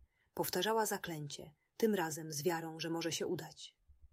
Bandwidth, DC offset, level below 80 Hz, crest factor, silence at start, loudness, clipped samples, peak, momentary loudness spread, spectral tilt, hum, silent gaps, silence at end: 16 kHz; under 0.1%; -72 dBFS; 18 dB; 0.35 s; -38 LUFS; under 0.1%; -20 dBFS; 16 LU; -3.5 dB/octave; none; none; 0.05 s